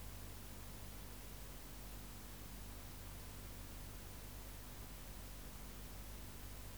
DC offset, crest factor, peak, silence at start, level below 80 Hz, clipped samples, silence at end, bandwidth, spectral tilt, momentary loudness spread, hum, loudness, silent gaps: 0.1%; 14 dB; -38 dBFS; 0 s; -56 dBFS; under 0.1%; 0 s; over 20 kHz; -4 dB/octave; 0 LU; 50 Hz at -55 dBFS; -53 LUFS; none